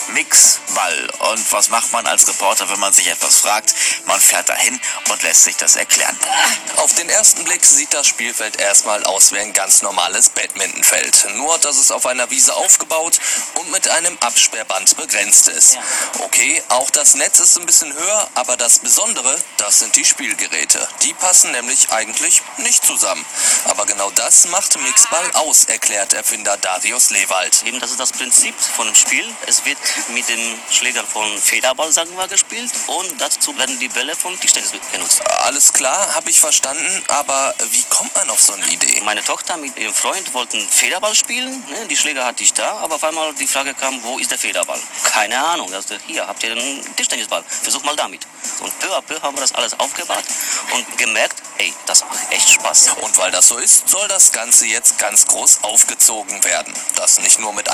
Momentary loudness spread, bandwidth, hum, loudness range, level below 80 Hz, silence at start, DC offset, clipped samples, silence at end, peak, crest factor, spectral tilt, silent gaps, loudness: 10 LU; over 20 kHz; none; 8 LU; -66 dBFS; 0 s; under 0.1%; 0.1%; 0 s; 0 dBFS; 16 dB; 2 dB/octave; none; -12 LUFS